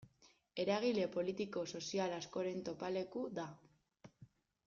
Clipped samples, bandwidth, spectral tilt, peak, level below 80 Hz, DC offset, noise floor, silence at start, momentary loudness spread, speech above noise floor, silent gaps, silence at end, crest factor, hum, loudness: under 0.1%; 7.4 kHz; -4.5 dB/octave; -24 dBFS; -78 dBFS; under 0.1%; -71 dBFS; 0 s; 8 LU; 31 dB; none; 0.4 s; 18 dB; none; -41 LUFS